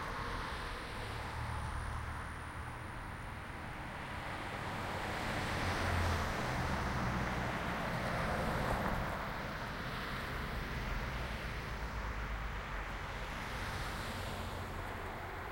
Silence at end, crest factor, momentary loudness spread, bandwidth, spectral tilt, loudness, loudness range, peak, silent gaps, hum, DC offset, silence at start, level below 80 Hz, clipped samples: 0 s; 18 dB; 8 LU; 16 kHz; -5 dB/octave; -40 LUFS; 7 LU; -20 dBFS; none; none; under 0.1%; 0 s; -46 dBFS; under 0.1%